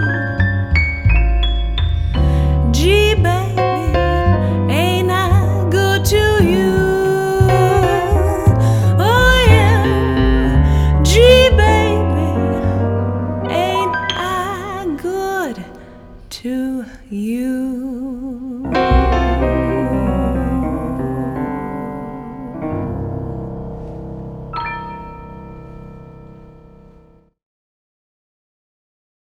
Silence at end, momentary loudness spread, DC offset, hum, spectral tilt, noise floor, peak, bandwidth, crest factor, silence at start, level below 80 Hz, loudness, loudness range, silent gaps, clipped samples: 2.75 s; 16 LU; under 0.1%; none; -6 dB/octave; -48 dBFS; 0 dBFS; 16 kHz; 16 dB; 0 s; -22 dBFS; -15 LUFS; 14 LU; none; under 0.1%